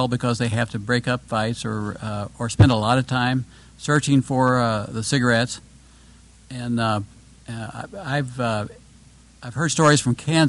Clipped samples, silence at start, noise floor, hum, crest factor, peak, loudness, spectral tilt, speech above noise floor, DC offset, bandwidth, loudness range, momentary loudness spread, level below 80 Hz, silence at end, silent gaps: under 0.1%; 0 s; -50 dBFS; none; 16 dB; -6 dBFS; -21 LUFS; -5 dB/octave; 28 dB; under 0.1%; 11.5 kHz; 7 LU; 17 LU; -46 dBFS; 0 s; none